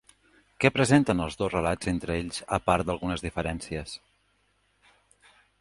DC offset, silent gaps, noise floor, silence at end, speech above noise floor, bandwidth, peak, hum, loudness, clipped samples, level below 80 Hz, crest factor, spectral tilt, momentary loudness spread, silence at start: under 0.1%; none; -69 dBFS; 1.65 s; 43 dB; 11.5 kHz; -4 dBFS; 50 Hz at -55 dBFS; -27 LUFS; under 0.1%; -46 dBFS; 24 dB; -5.5 dB/octave; 13 LU; 0.6 s